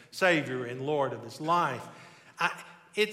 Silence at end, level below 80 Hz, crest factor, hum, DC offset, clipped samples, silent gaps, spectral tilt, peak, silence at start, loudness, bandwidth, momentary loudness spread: 0 s; -80 dBFS; 18 dB; none; under 0.1%; under 0.1%; none; -4.5 dB/octave; -12 dBFS; 0 s; -30 LUFS; 16 kHz; 16 LU